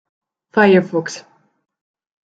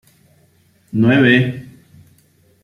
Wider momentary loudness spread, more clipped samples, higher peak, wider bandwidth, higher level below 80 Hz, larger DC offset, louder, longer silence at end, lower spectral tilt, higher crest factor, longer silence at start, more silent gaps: first, 18 LU vs 15 LU; neither; about the same, -2 dBFS vs -2 dBFS; second, 8 kHz vs 11.5 kHz; second, -62 dBFS vs -56 dBFS; neither; about the same, -15 LUFS vs -14 LUFS; about the same, 1.05 s vs 1 s; second, -6 dB/octave vs -8 dB/octave; about the same, 18 dB vs 16 dB; second, 0.55 s vs 0.95 s; neither